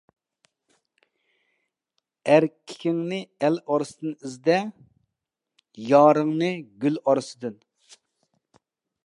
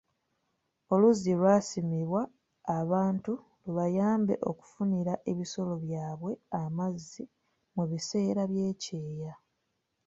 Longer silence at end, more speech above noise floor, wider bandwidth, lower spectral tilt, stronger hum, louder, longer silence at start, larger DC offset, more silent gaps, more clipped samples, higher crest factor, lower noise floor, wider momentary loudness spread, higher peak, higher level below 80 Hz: first, 1.55 s vs 0.7 s; first, 62 dB vs 50 dB; first, 11 kHz vs 8 kHz; about the same, -6.5 dB/octave vs -7 dB/octave; neither; first, -23 LUFS vs -31 LUFS; first, 2.25 s vs 0.9 s; neither; neither; neither; about the same, 22 dB vs 20 dB; first, -85 dBFS vs -80 dBFS; about the same, 16 LU vs 15 LU; first, -4 dBFS vs -12 dBFS; second, -80 dBFS vs -70 dBFS